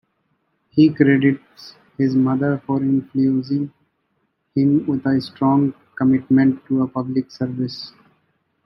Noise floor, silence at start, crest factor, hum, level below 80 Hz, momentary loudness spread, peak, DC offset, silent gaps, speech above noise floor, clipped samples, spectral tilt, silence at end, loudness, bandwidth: -69 dBFS; 0.75 s; 18 dB; none; -64 dBFS; 11 LU; -2 dBFS; under 0.1%; none; 51 dB; under 0.1%; -9 dB/octave; 0.75 s; -19 LUFS; 6 kHz